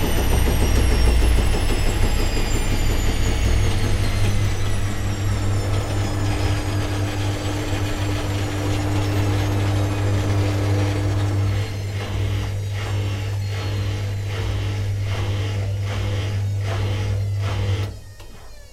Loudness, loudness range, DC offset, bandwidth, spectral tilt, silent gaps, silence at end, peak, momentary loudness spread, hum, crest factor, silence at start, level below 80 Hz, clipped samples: -23 LUFS; 3 LU; under 0.1%; 14.5 kHz; -5.5 dB/octave; none; 0.05 s; -4 dBFS; 5 LU; none; 16 dB; 0 s; -24 dBFS; under 0.1%